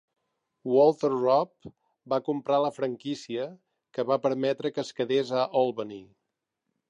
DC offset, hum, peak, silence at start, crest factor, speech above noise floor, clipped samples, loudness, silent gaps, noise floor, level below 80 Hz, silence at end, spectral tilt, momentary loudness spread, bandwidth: under 0.1%; none; -10 dBFS; 0.65 s; 18 dB; 57 dB; under 0.1%; -27 LUFS; none; -84 dBFS; -76 dBFS; 0.85 s; -6 dB/octave; 15 LU; 10 kHz